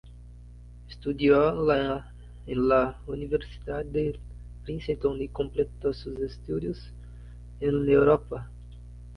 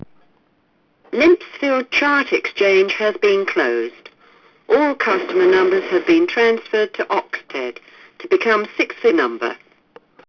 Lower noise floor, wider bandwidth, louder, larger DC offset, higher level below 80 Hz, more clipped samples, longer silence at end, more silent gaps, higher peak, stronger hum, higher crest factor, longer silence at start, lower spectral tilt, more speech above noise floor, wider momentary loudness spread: second, -46 dBFS vs -61 dBFS; about the same, 5.8 kHz vs 5.4 kHz; second, -27 LUFS vs -17 LUFS; neither; first, -44 dBFS vs -60 dBFS; neither; second, 0 s vs 0.75 s; neither; about the same, -8 dBFS vs -6 dBFS; first, 60 Hz at -45 dBFS vs none; first, 20 dB vs 12 dB; second, 0.05 s vs 1.15 s; first, -8.5 dB/octave vs -4.5 dB/octave; second, 20 dB vs 44 dB; first, 25 LU vs 12 LU